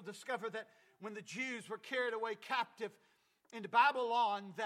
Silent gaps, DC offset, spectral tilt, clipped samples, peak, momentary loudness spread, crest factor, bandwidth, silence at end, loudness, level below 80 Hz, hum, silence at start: none; under 0.1%; -3 dB/octave; under 0.1%; -16 dBFS; 18 LU; 22 dB; 14.5 kHz; 0 s; -37 LUFS; under -90 dBFS; none; 0 s